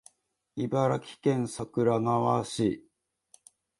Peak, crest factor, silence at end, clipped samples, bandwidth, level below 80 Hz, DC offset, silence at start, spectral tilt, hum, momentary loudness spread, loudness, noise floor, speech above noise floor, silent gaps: -12 dBFS; 18 dB; 1 s; under 0.1%; 11.5 kHz; -64 dBFS; under 0.1%; 0.55 s; -6.5 dB/octave; none; 8 LU; -29 LUFS; -73 dBFS; 46 dB; none